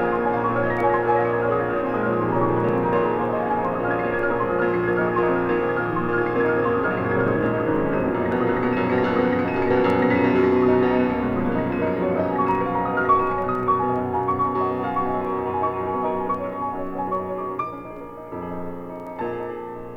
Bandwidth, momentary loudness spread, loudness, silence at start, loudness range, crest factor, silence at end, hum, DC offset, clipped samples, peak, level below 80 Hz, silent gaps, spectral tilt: 5.8 kHz; 10 LU; -22 LUFS; 0 s; 6 LU; 14 dB; 0 s; none; under 0.1%; under 0.1%; -8 dBFS; -46 dBFS; none; -9 dB/octave